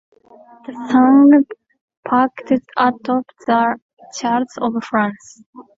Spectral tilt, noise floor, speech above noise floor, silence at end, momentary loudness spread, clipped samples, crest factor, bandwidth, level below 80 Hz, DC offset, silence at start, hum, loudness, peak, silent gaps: -5.5 dB/octave; -45 dBFS; 30 dB; 0.15 s; 20 LU; under 0.1%; 16 dB; 7.8 kHz; -62 dBFS; under 0.1%; 0.7 s; none; -16 LUFS; -2 dBFS; 1.81-1.88 s, 1.97-2.03 s, 3.82-3.97 s, 5.46-5.53 s